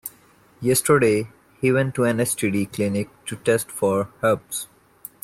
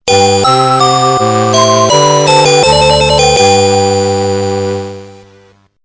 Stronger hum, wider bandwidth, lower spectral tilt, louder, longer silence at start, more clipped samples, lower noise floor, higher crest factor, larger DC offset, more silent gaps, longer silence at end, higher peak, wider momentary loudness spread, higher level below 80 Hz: second, none vs 50 Hz at -40 dBFS; first, 16 kHz vs 8 kHz; first, -5 dB/octave vs -3.5 dB/octave; second, -22 LUFS vs -8 LUFS; about the same, 0.05 s vs 0.05 s; second, under 0.1% vs 0.7%; first, -54 dBFS vs -44 dBFS; first, 16 dB vs 8 dB; neither; neither; about the same, 0.6 s vs 0.7 s; second, -6 dBFS vs 0 dBFS; first, 16 LU vs 7 LU; second, -60 dBFS vs -32 dBFS